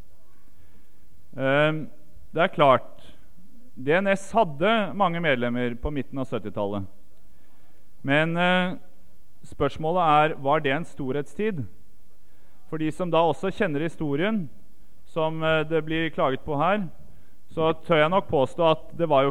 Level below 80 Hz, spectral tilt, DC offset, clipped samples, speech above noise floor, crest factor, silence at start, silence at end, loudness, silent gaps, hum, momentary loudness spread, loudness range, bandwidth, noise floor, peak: -50 dBFS; -6.5 dB/octave; 2%; under 0.1%; 34 dB; 20 dB; 1.35 s; 0 s; -24 LUFS; none; none; 13 LU; 4 LU; 15.5 kHz; -58 dBFS; -6 dBFS